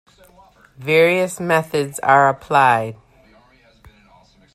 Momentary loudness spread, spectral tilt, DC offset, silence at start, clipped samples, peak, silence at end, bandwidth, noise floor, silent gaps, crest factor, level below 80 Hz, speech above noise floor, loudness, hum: 8 LU; -5 dB/octave; under 0.1%; 0.8 s; under 0.1%; 0 dBFS; 1.6 s; 14.5 kHz; -52 dBFS; none; 18 dB; -58 dBFS; 36 dB; -16 LUFS; none